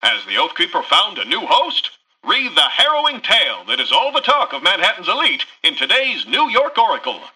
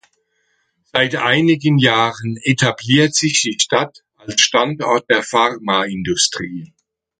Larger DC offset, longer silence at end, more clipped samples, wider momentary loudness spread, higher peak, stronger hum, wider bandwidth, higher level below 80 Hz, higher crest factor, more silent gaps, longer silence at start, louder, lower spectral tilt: neither; second, 0.05 s vs 0.55 s; neither; second, 5 LU vs 8 LU; about the same, -2 dBFS vs 0 dBFS; neither; first, 12.5 kHz vs 9.4 kHz; second, -66 dBFS vs -54 dBFS; about the same, 14 dB vs 18 dB; neither; second, 0 s vs 0.95 s; about the same, -15 LUFS vs -15 LUFS; second, -0.5 dB/octave vs -3.5 dB/octave